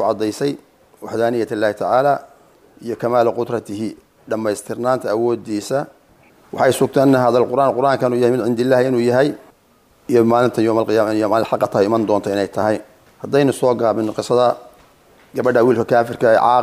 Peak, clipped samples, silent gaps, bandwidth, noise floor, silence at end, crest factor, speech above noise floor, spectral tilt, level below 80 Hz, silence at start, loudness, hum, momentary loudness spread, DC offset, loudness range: -2 dBFS; under 0.1%; none; 15.5 kHz; -54 dBFS; 0 s; 14 dB; 38 dB; -6 dB/octave; -60 dBFS; 0 s; -17 LUFS; none; 12 LU; under 0.1%; 5 LU